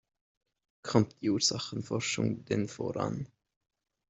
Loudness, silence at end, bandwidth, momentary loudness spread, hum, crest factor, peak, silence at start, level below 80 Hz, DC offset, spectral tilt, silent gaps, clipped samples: -32 LUFS; 0.85 s; 8.2 kHz; 10 LU; none; 24 dB; -10 dBFS; 0.85 s; -66 dBFS; under 0.1%; -4.5 dB/octave; none; under 0.1%